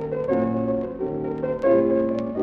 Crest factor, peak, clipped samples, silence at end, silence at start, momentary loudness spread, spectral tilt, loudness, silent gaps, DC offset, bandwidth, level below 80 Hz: 14 dB; -8 dBFS; under 0.1%; 0 s; 0 s; 8 LU; -10 dB/octave; -23 LUFS; none; under 0.1%; 5.4 kHz; -50 dBFS